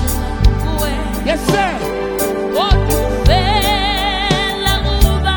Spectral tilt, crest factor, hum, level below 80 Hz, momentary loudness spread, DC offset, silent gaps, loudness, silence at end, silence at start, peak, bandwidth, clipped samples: -4.5 dB/octave; 14 dB; none; -18 dBFS; 5 LU; under 0.1%; none; -15 LUFS; 0 s; 0 s; 0 dBFS; 19.5 kHz; under 0.1%